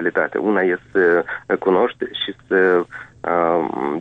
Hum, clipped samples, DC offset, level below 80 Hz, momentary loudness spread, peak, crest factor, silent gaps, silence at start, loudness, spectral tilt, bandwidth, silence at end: none; under 0.1%; under 0.1%; -58 dBFS; 8 LU; -4 dBFS; 14 dB; none; 0 s; -19 LUFS; -7 dB/octave; 4.6 kHz; 0 s